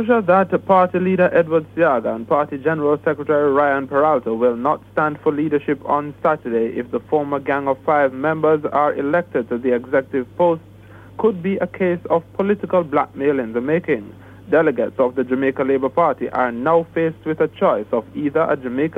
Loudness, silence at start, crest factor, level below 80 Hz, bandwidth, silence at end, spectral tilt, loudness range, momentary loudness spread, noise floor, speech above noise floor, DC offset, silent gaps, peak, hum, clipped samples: -19 LUFS; 0 s; 16 dB; -56 dBFS; 4.2 kHz; 0 s; -9 dB/octave; 3 LU; 6 LU; -41 dBFS; 23 dB; under 0.1%; none; -2 dBFS; none; under 0.1%